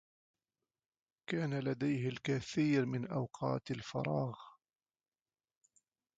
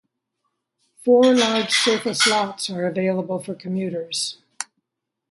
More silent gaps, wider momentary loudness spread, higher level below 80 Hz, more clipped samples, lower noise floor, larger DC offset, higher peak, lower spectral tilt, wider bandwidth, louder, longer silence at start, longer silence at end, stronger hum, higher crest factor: neither; second, 8 LU vs 13 LU; about the same, -72 dBFS vs -72 dBFS; neither; first, under -90 dBFS vs -80 dBFS; neither; second, -22 dBFS vs -4 dBFS; first, -7 dB/octave vs -3.5 dB/octave; second, 8 kHz vs 11.5 kHz; second, -37 LUFS vs -20 LUFS; first, 1.3 s vs 1.05 s; first, 1.65 s vs 0.7 s; neither; about the same, 18 dB vs 18 dB